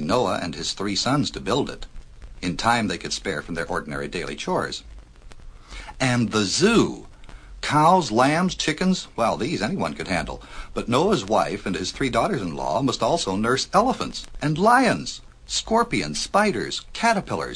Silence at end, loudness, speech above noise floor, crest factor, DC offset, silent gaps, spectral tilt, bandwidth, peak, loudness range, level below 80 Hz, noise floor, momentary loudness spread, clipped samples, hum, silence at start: 0 s; -23 LUFS; 20 dB; 20 dB; under 0.1%; none; -4.5 dB/octave; 10.5 kHz; -4 dBFS; 6 LU; -42 dBFS; -42 dBFS; 12 LU; under 0.1%; none; 0 s